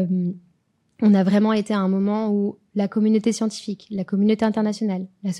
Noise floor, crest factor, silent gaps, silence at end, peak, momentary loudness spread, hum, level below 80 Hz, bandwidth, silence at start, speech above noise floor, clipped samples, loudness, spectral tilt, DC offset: -66 dBFS; 14 dB; none; 0 s; -8 dBFS; 11 LU; none; -68 dBFS; 11 kHz; 0 s; 45 dB; under 0.1%; -21 LUFS; -7 dB/octave; under 0.1%